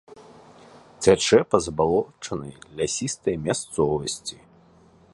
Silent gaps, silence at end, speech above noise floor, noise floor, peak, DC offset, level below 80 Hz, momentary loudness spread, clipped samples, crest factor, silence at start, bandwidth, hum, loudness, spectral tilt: none; 0.8 s; 31 dB; -54 dBFS; -2 dBFS; under 0.1%; -50 dBFS; 14 LU; under 0.1%; 22 dB; 0.1 s; 11.5 kHz; none; -23 LUFS; -4 dB/octave